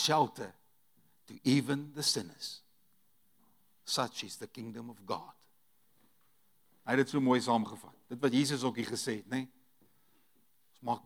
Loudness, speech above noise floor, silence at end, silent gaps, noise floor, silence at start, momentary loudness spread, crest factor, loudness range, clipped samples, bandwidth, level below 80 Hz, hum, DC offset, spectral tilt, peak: -33 LUFS; 40 dB; 0.05 s; none; -74 dBFS; 0 s; 18 LU; 22 dB; 9 LU; under 0.1%; 17.5 kHz; -86 dBFS; none; under 0.1%; -4 dB/octave; -14 dBFS